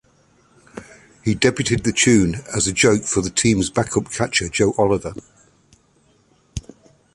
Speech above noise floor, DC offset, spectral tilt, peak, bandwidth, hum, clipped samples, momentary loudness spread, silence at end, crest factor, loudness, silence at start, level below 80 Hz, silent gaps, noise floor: 40 dB; under 0.1%; -4 dB/octave; -2 dBFS; 11.5 kHz; none; under 0.1%; 20 LU; 0.55 s; 20 dB; -18 LUFS; 0.75 s; -42 dBFS; none; -58 dBFS